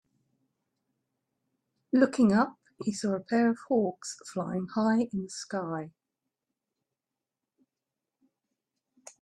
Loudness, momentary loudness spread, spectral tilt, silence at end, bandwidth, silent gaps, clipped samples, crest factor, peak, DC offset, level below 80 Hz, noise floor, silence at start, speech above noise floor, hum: -29 LUFS; 13 LU; -6 dB/octave; 3.3 s; 11 kHz; none; under 0.1%; 24 dB; -8 dBFS; under 0.1%; -72 dBFS; -89 dBFS; 1.95 s; 61 dB; none